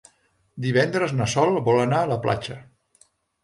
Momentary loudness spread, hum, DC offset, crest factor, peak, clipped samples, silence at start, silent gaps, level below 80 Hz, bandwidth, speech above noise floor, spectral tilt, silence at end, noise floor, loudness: 10 LU; none; under 0.1%; 18 dB; -6 dBFS; under 0.1%; 0.55 s; none; -56 dBFS; 11.5 kHz; 42 dB; -5.5 dB/octave; 0.8 s; -64 dBFS; -22 LUFS